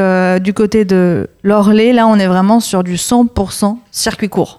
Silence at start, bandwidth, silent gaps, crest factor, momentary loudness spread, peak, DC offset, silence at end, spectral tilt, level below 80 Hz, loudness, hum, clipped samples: 0 s; 14.5 kHz; none; 10 dB; 8 LU; 0 dBFS; under 0.1%; 0.05 s; -5.5 dB/octave; -38 dBFS; -12 LUFS; none; under 0.1%